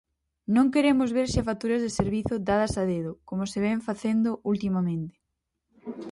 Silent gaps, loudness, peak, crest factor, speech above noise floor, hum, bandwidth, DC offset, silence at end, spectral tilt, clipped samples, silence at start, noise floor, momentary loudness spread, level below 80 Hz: none; -26 LUFS; -10 dBFS; 18 dB; 56 dB; none; 11.5 kHz; under 0.1%; 0 s; -6.5 dB/octave; under 0.1%; 0.5 s; -81 dBFS; 12 LU; -46 dBFS